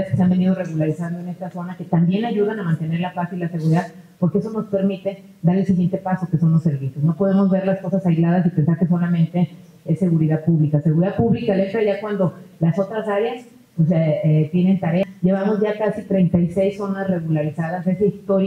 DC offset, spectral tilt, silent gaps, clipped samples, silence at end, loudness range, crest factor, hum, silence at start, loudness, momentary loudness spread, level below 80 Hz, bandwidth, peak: under 0.1%; -9.5 dB/octave; none; under 0.1%; 0 s; 3 LU; 16 dB; none; 0 s; -20 LUFS; 7 LU; -54 dBFS; 6.2 kHz; -4 dBFS